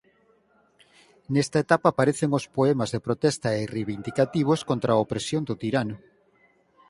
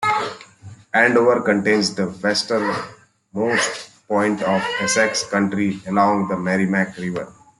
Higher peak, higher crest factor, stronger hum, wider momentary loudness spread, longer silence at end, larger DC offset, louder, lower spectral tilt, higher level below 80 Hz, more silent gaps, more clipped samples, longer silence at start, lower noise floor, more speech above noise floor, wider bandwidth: about the same, -4 dBFS vs -2 dBFS; about the same, 22 dB vs 18 dB; neither; second, 7 LU vs 11 LU; first, 0.95 s vs 0.25 s; neither; second, -25 LUFS vs -19 LUFS; first, -6 dB/octave vs -4 dB/octave; about the same, -60 dBFS vs -62 dBFS; neither; neither; first, 1.3 s vs 0 s; first, -63 dBFS vs -42 dBFS; first, 39 dB vs 23 dB; about the same, 11.5 kHz vs 11.5 kHz